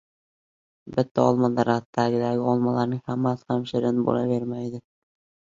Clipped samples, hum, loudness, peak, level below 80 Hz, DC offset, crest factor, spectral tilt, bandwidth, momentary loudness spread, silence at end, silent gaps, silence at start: under 0.1%; none; -24 LUFS; -6 dBFS; -62 dBFS; under 0.1%; 20 dB; -8 dB/octave; 7.4 kHz; 8 LU; 0.75 s; 1.11-1.15 s, 1.85-1.93 s; 0.85 s